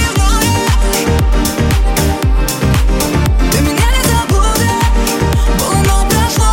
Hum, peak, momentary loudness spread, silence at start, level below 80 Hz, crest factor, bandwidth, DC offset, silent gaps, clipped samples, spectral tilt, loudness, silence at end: none; 0 dBFS; 2 LU; 0 s; -14 dBFS; 10 dB; 17 kHz; under 0.1%; none; under 0.1%; -4.5 dB/octave; -13 LUFS; 0 s